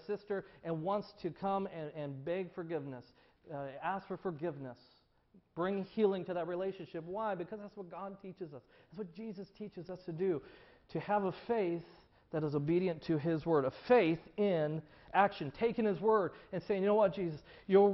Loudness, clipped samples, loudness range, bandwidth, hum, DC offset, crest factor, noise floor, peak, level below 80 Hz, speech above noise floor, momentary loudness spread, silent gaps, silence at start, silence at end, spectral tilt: -36 LUFS; under 0.1%; 10 LU; 6 kHz; none; under 0.1%; 20 dB; -68 dBFS; -16 dBFS; -70 dBFS; 33 dB; 17 LU; none; 0.1 s; 0 s; -6 dB/octave